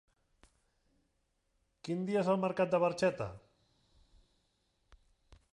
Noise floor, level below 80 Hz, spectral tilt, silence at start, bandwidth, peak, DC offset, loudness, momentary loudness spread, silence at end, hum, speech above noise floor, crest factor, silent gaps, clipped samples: -79 dBFS; -68 dBFS; -6.5 dB/octave; 1.85 s; 11.5 kHz; -18 dBFS; under 0.1%; -33 LUFS; 12 LU; 2.15 s; none; 47 dB; 20 dB; none; under 0.1%